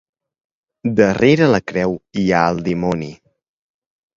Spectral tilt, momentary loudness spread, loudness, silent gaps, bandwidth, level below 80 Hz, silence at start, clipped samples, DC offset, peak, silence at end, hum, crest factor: -7 dB/octave; 11 LU; -17 LUFS; none; 7.6 kHz; -48 dBFS; 0.85 s; under 0.1%; under 0.1%; 0 dBFS; 1 s; none; 18 dB